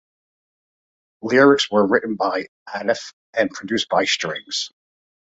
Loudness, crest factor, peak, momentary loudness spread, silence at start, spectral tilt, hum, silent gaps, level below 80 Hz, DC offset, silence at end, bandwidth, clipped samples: -20 LUFS; 20 dB; -2 dBFS; 13 LU; 1.25 s; -3.5 dB/octave; none; 2.48-2.66 s, 3.13-3.33 s; -64 dBFS; under 0.1%; 0.55 s; 8.2 kHz; under 0.1%